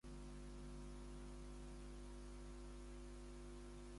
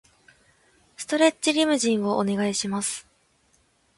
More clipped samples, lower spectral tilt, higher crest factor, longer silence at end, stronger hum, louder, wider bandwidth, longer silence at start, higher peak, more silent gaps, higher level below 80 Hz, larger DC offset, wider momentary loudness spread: neither; first, -5.5 dB/octave vs -3.5 dB/octave; second, 10 dB vs 20 dB; second, 0 s vs 0.95 s; first, 50 Hz at -55 dBFS vs none; second, -57 LUFS vs -23 LUFS; about the same, 11.5 kHz vs 11.5 kHz; second, 0.05 s vs 1 s; second, -44 dBFS vs -6 dBFS; neither; first, -56 dBFS vs -66 dBFS; neither; second, 1 LU vs 9 LU